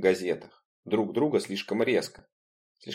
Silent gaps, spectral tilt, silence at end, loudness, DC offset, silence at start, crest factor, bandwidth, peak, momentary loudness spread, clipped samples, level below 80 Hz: 0.65-0.83 s, 2.32-2.75 s; -5 dB/octave; 0 s; -28 LUFS; under 0.1%; 0 s; 20 dB; 16 kHz; -10 dBFS; 10 LU; under 0.1%; -70 dBFS